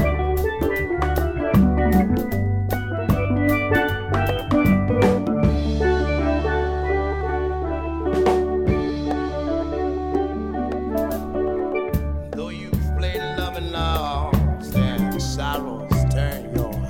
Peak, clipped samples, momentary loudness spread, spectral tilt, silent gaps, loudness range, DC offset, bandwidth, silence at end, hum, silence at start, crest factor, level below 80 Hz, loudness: -4 dBFS; under 0.1%; 7 LU; -7 dB/octave; none; 5 LU; under 0.1%; 18 kHz; 0 s; none; 0 s; 16 dB; -28 dBFS; -22 LUFS